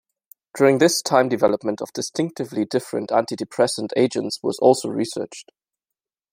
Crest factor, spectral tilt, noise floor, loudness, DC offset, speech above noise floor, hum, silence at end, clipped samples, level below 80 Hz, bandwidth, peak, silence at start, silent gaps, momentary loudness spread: 20 dB; -4.5 dB/octave; -87 dBFS; -21 LUFS; under 0.1%; 66 dB; none; 0.9 s; under 0.1%; -66 dBFS; 16 kHz; -2 dBFS; 0.55 s; none; 10 LU